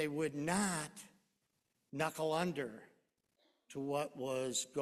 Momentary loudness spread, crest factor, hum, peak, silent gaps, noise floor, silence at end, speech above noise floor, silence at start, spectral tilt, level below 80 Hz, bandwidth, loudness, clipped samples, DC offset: 14 LU; 20 dB; none; -20 dBFS; none; -83 dBFS; 0 s; 45 dB; 0 s; -4 dB/octave; -74 dBFS; 14.5 kHz; -39 LUFS; under 0.1%; under 0.1%